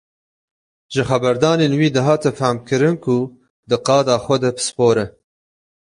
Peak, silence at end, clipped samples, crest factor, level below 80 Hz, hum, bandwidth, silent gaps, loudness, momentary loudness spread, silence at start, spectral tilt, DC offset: -2 dBFS; 0.75 s; under 0.1%; 16 dB; -52 dBFS; none; 11.5 kHz; 3.50-3.63 s; -17 LUFS; 7 LU; 0.9 s; -5.5 dB/octave; under 0.1%